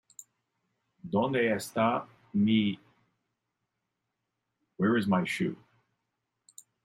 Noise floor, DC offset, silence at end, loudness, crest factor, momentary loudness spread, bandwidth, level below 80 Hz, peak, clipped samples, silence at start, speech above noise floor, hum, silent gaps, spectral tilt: -84 dBFS; under 0.1%; 1.3 s; -29 LUFS; 18 dB; 9 LU; 15.5 kHz; -72 dBFS; -14 dBFS; under 0.1%; 1.05 s; 56 dB; none; none; -6 dB/octave